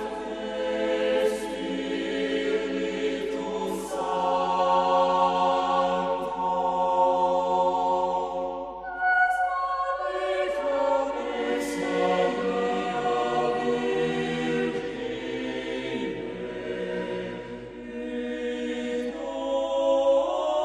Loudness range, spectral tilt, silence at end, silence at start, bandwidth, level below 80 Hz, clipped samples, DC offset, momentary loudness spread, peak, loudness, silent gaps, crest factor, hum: 8 LU; -5 dB/octave; 0 s; 0 s; 13 kHz; -56 dBFS; under 0.1%; under 0.1%; 10 LU; -12 dBFS; -26 LUFS; none; 16 dB; none